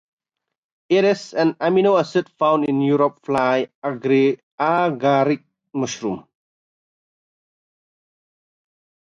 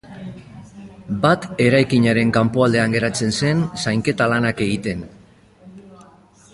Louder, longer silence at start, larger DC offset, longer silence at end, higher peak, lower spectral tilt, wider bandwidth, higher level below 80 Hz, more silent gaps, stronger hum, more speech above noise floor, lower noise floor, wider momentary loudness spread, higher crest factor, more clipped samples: about the same, -19 LUFS vs -18 LUFS; first, 0.9 s vs 0.1 s; neither; first, 3 s vs 0.5 s; second, -6 dBFS vs -2 dBFS; about the same, -6 dB/octave vs -5.5 dB/octave; second, 7.8 kHz vs 11.5 kHz; second, -66 dBFS vs -48 dBFS; first, 3.75-3.82 s, 4.43-4.58 s vs none; neither; first, 65 dB vs 31 dB; first, -83 dBFS vs -49 dBFS; second, 9 LU vs 20 LU; about the same, 16 dB vs 18 dB; neither